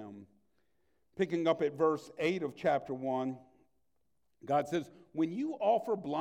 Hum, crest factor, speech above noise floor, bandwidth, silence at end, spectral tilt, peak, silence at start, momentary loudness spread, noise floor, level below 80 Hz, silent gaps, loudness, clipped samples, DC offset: none; 18 dB; 50 dB; 14 kHz; 0 s; -6.5 dB/octave; -16 dBFS; 0 s; 11 LU; -83 dBFS; -76 dBFS; none; -34 LUFS; under 0.1%; under 0.1%